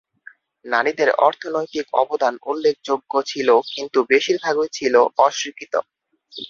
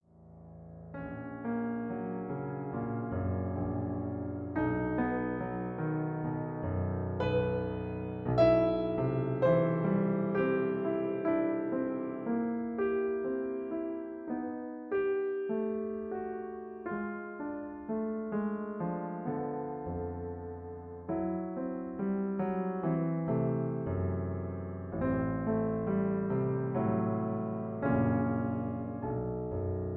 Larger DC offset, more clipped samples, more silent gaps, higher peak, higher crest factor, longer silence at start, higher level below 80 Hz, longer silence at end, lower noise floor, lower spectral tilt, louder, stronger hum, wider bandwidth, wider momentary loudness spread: neither; neither; neither; first, -2 dBFS vs -14 dBFS; about the same, 18 dB vs 20 dB; first, 0.65 s vs 0.2 s; second, -66 dBFS vs -56 dBFS; about the same, 0 s vs 0 s; second, -48 dBFS vs -54 dBFS; second, -2.5 dB/octave vs -11 dB/octave; first, -19 LUFS vs -34 LUFS; neither; first, 7.4 kHz vs 5.8 kHz; about the same, 9 LU vs 9 LU